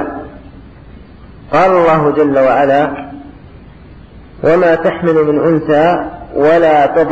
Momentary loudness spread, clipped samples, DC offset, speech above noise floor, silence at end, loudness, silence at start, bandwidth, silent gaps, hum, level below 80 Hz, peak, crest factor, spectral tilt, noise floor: 14 LU; under 0.1%; under 0.1%; 26 dB; 0 s; -11 LUFS; 0 s; 8 kHz; none; none; -40 dBFS; -2 dBFS; 10 dB; -8 dB/octave; -36 dBFS